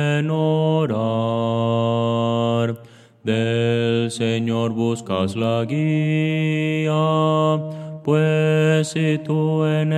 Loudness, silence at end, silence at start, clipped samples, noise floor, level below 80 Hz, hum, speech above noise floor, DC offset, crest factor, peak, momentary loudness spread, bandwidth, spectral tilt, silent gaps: -20 LUFS; 0 s; 0 s; under 0.1%; -45 dBFS; -66 dBFS; none; 26 dB; under 0.1%; 14 dB; -6 dBFS; 5 LU; 10.5 kHz; -7 dB/octave; none